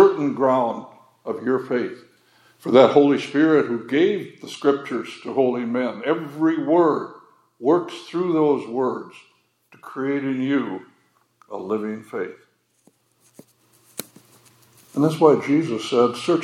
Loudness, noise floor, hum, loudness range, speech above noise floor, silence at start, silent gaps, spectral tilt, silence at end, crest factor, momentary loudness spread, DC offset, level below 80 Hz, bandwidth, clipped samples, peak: -21 LUFS; -62 dBFS; none; 14 LU; 42 dB; 0 s; none; -6.5 dB/octave; 0 s; 20 dB; 17 LU; under 0.1%; -80 dBFS; 17 kHz; under 0.1%; -2 dBFS